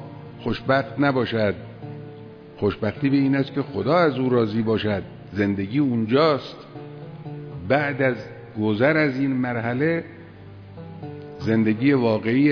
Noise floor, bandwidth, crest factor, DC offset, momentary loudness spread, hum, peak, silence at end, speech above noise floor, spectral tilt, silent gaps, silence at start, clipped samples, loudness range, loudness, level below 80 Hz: -42 dBFS; 5.4 kHz; 16 dB; under 0.1%; 19 LU; none; -6 dBFS; 0 s; 21 dB; -9 dB/octave; none; 0 s; under 0.1%; 2 LU; -22 LUFS; -54 dBFS